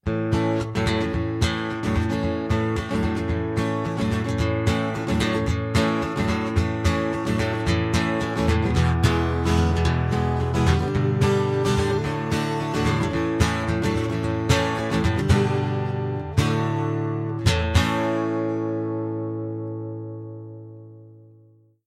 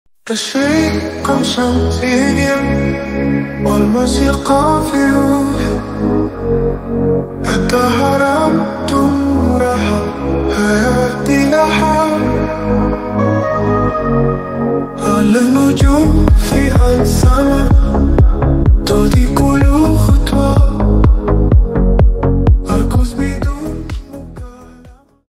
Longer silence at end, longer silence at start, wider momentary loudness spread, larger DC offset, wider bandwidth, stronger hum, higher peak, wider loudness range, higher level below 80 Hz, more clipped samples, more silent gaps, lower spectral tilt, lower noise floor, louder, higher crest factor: first, 0.65 s vs 0.35 s; second, 0.05 s vs 0.25 s; about the same, 6 LU vs 6 LU; neither; second, 14 kHz vs 15.5 kHz; neither; second, -4 dBFS vs 0 dBFS; about the same, 3 LU vs 3 LU; second, -34 dBFS vs -18 dBFS; neither; neither; about the same, -6.5 dB/octave vs -6.5 dB/octave; first, -55 dBFS vs -41 dBFS; second, -23 LUFS vs -13 LUFS; first, 18 dB vs 12 dB